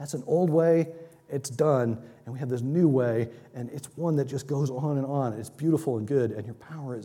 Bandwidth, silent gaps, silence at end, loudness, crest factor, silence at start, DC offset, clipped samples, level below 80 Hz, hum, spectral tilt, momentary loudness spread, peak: 16 kHz; none; 0 s; -27 LUFS; 16 dB; 0 s; under 0.1%; under 0.1%; -70 dBFS; none; -8 dB/octave; 15 LU; -10 dBFS